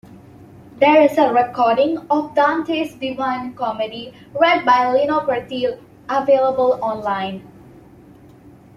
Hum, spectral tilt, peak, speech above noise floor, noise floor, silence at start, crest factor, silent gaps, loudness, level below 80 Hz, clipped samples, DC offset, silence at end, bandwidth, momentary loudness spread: none; -5.5 dB/octave; -2 dBFS; 27 dB; -45 dBFS; 0.1 s; 16 dB; none; -18 LUFS; -58 dBFS; under 0.1%; under 0.1%; 1.3 s; 13.5 kHz; 11 LU